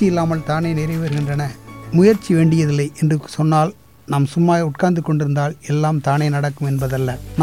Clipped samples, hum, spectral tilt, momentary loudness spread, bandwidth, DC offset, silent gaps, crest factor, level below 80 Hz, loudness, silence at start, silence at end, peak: under 0.1%; none; -7.5 dB/octave; 8 LU; 15 kHz; 0.3%; none; 14 dB; -44 dBFS; -18 LUFS; 0 s; 0 s; -4 dBFS